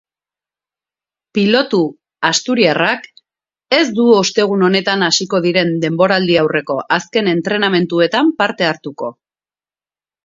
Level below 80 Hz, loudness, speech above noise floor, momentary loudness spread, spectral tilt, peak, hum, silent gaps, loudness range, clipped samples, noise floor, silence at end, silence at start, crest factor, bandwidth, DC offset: -62 dBFS; -14 LUFS; over 76 dB; 7 LU; -4 dB/octave; 0 dBFS; none; none; 3 LU; under 0.1%; under -90 dBFS; 1.1 s; 1.35 s; 16 dB; 7.8 kHz; under 0.1%